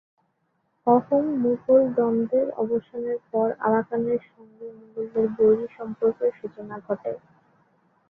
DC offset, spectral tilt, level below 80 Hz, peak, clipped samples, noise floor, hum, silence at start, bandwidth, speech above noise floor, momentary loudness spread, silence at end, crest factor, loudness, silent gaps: under 0.1%; -11 dB/octave; -66 dBFS; -6 dBFS; under 0.1%; -72 dBFS; none; 0.85 s; 3.4 kHz; 48 dB; 17 LU; 0.9 s; 18 dB; -24 LUFS; none